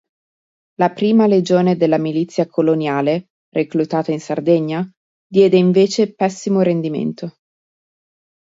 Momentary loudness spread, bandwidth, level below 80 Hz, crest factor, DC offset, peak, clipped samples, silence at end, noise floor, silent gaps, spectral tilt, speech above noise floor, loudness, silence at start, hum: 10 LU; 7.8 kHz; -64 dBFS; 16 dB; under 0.1%; -2 dBFS; under 0.1%; 1.15 s; under -90 dBFS; 3.30-3.52 s, 4.97-5.30 s; -7 dB/octave; over 74 dB; -17 LUFS; 0.8 s; none